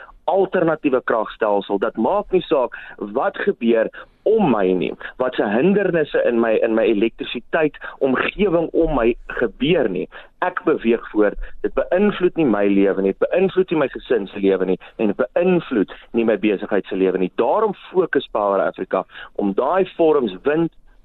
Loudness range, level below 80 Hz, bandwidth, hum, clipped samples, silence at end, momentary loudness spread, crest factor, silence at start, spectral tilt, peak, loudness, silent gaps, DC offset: 2 LU; -42 dBFS; 4.2 kHz; none; under 0.1%; 0.35 s; 7 LU; 12 dB; 0 s; -9.5 dB/octave; -6 dBFS; -19 LUFS; none; under 0.1%